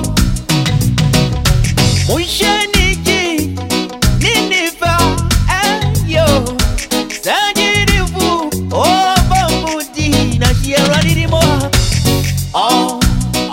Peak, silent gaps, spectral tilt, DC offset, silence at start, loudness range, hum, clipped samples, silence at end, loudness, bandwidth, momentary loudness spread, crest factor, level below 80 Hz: 0 dBFS; none; -4 dB/octave; under 0.1%; 0 s; 1 LU; none; under 0.1%; 0 s; -13 LUFS; 16.5 kHz; 5 LU; 12 dB; -20 dBFS